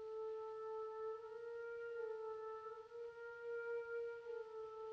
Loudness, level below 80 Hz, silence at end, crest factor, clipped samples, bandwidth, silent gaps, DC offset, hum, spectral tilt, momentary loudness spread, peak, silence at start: -49 LUFS; -86 dBFS; 0 s; 10 dB; under 0.1%; 6.8 kHz; none; under 0.1%; none; -4 dB/octave; 6 LU; -38 dBFS; 0 s